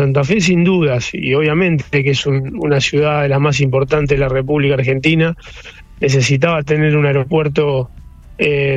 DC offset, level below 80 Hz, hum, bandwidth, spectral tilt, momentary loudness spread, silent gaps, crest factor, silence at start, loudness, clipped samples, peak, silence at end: under 0.1%; -36 dBFS; none; 8 kHz; -6 dB/octave; 5 LU; none; 14 dB; 0 s; -14 LUFS; under 0.1%; -2 dBFS; 0 s